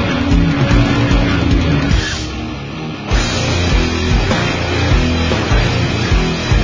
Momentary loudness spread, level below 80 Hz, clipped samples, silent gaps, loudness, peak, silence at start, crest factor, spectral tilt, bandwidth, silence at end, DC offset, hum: 8 LU; -18 dBFS; under 0.1%; none; -15 LUFS; 0 dBFS; 0 s; 14 dB; -5.5 dB/octave; 7.6 kHz; 0 s; under 0.1%; none